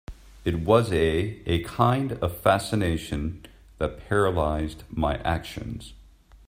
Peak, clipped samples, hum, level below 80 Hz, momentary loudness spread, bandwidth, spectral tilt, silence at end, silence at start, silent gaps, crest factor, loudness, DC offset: -6 dBFS; under 0.1%; none; -40 dBFS; 12 LU; 16 kHz; -6.5 dB/octave; 0.45 s; 0.1 s; none; 20 dB; -26 LUFS; under 0.1%